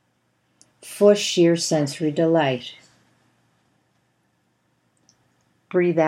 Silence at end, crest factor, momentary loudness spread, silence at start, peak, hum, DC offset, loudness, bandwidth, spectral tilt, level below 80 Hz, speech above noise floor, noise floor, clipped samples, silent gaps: 0 s; 20 dB; 12 LU; 0.85 s; -4 dBFS; none; under 0.1%; -20 LUFS; 15.5 kHz; -5 dB/octave; -78 dBFS; 49 dB; -68 dBFS; under 0.1%; none